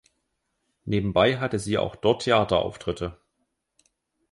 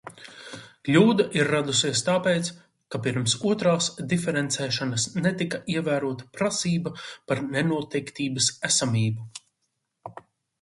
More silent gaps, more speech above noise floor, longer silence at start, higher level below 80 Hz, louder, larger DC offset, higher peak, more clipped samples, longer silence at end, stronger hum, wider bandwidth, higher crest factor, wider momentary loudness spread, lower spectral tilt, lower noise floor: neither; about the same, 53 dB vs 53 dB; first, 0.85 s vs 0.05 s; first, -48 dBFS vs -64 dBFS; about the same, -24 LUFS vs -25 LUFS; neither; about the same, -6 dBFS vs -6 dBFS; neither; first, 1.2 s vs 0.4 s; neither; about the same, 11.5 kHz vs 11.5 kHz; about the same, 20 dB vs 20 dB; second, 11 LU vs 19 LU; first, -5.5 dB/octave vs -4 dB/octave; about the same, -76 dBFS vs -78 dBFS